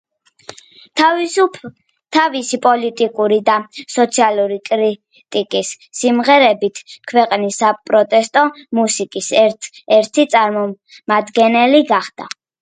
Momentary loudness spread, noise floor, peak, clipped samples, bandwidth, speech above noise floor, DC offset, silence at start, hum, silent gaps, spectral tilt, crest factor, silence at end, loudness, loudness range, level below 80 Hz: 11 LU; -40 dBFS; 0 dBFS; under 0.1%; 9.4 kHz; 25 dB; under 0.1%; 0.95 s; none; none; -3 dB/octave; 16 dB; 0.35 s; -15 LUFS; 2 LU; -68 dBFS